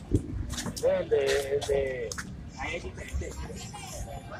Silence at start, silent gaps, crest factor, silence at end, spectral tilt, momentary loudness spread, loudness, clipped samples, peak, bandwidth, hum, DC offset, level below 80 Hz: 0 s; none; 20 dB; 0 s; -4.5 dB/octave; 13 LU; -31 LUFS; under 0.1%; -10 dBFS; 16 kHz; none; under 0.1%; -42 dBFS